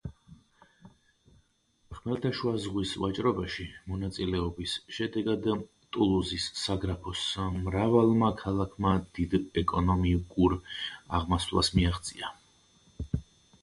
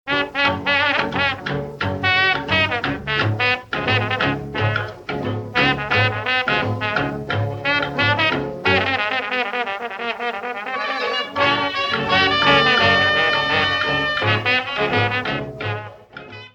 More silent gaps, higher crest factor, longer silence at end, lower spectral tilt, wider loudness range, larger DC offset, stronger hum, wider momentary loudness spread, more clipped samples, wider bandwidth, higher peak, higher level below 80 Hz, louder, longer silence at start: neither; about the same, 20 dB vs 18 dB; first, 0.4 s vs 0.05 s; about the same, -6 dB/octave vs -5.5 dB/octave; about the same, 6 LU vs 4 LU; neither; neither; about the same, 11 LU vs 11 LU; neither; first, 11.5 kHz vs 8.6 kHz; second, -10 dBFS vs -2 dBFS; first, -42 dBFS vs -48 dBFS; second, -30 LUFS vs -19 LUFS; about the same, 0.05 s vs 0.05 s